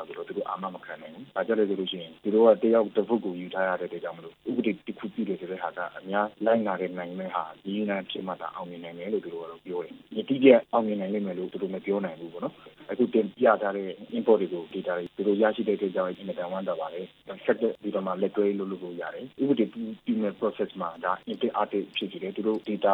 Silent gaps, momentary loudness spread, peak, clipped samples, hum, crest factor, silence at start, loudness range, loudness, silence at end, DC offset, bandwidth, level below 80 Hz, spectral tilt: none; 13 LU; -2 dBFS; under 0.1%; none; 24 dB; 0 s; 5 LU; -28 LUFS; 0 s; under 0.1%; 4.2 kHz; -76 dBFS; -8.5 dB/octave